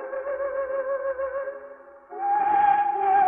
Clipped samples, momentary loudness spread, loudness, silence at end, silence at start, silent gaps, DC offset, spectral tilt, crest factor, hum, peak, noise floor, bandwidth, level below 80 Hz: under 0.1%; 17 LU; -25 LUFS; 0 s; 0 s; none; under 0.1%; -8 dB/octave; 14 dB; none; -10 dBFS; -45 dBFS; 3.5 kHz; -64 dBFS